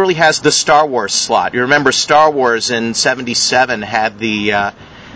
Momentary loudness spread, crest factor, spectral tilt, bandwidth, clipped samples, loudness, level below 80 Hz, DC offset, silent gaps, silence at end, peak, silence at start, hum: 6 LU; 14 dB; -2.5 dB/octave; 8 kHz; 0.1%; -12 LUFS; -48 dBFS; under 0.1%; none; 0 s; 0 dBFS; 0 s; none